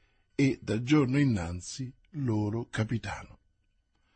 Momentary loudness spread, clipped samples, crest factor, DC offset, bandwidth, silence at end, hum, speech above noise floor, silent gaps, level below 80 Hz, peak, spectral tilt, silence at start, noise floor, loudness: 14 LU; under 0.1%; 18 dB; under 0.1%; 8.8 kHz; 0.8 s; none; 43 dB; none; -56 dBFS; -12 dBFS; -6.5 dB/octave; 0.4 s; -72 dBFS; -30 LUFS